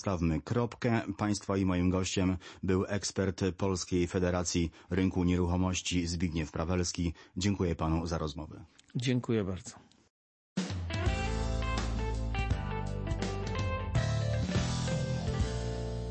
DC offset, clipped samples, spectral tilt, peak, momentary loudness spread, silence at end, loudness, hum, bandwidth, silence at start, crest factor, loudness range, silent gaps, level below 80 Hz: under 0.1%; under 0.1%; -5.5 dB/octave; -16 dBFS; 7 LU; 0 s; -33 LUFS; none; 8.8 kHz; 0 s; 16 dB; 4 LU; 10.10-10.56 s; -42 dBFS